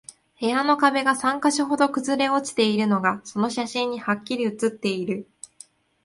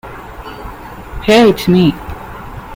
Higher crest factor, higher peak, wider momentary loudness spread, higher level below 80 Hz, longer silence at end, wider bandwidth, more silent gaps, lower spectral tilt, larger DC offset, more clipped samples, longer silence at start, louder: about the same, 18 dB vs 14 dB; second, -4 dBFS vs 0 dBFS; second, 9 LU vs 21 LU; second, -68 dBFS vs -34 dBFS; first, 0.8 s vs 0 s; second, 11.5 kHz vs 16.5 kHz; neither; second, -4 dB/octave vs -6 dB/octave; neither; neither; first, 0.4 s vs 0.05 s; second, -23 LUFS vs -11 LUFS